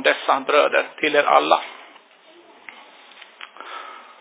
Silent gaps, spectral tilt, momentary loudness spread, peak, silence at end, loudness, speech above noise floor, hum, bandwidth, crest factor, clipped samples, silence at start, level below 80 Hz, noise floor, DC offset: none; -6 dB/octave; 24 LU; 0 dBFS; 0.2 s; -18 LUFS; 32 dB; none; 4 kHz; 22 dB; under 0.1%; 0 s; under -90 dBFS; -50 dBFS; under 0.1%